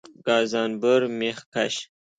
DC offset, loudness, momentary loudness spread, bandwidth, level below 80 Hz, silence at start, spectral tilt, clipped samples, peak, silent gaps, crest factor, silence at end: under 0.1%; -24 LUFS; 7 LU; 9.4 kHz; -72 dBFS; 0.25 s; -4 dB/octave; under 0.1%; -8 dBFS; 1.46-1.52 s; 16 dB; 0.35 s